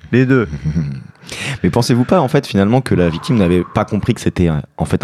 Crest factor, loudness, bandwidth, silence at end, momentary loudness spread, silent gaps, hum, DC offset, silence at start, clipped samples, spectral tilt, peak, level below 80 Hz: 14 dB; -15 LUFS; 13.5 kHz; 0.05 s; 9 LU; none; none; under 0.1%; 0.05 s; under 0.1%; -7 dB/octave; 0 dBFS; -36 dBFS